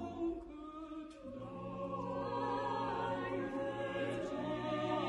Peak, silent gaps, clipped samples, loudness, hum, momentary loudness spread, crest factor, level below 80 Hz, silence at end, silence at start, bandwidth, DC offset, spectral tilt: -26 dBFS; none; under 0.1%; -41 LUFS; none; 11 LU; 14 dB; -64 dBFS; 0 s; 0 s; 11 kHz; under 0.1%; -6.5 dB/octave